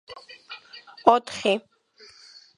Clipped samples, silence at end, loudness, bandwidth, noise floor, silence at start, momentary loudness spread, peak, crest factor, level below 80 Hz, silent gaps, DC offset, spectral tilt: under 0.1%; 1 s; -23 LUFS; 11 kHz; -53 dBFS; 0.1 s; 24 LU; 0 dBFS; 26 dB; -68 dBFS; none; under 0.1%; -4 dB/octave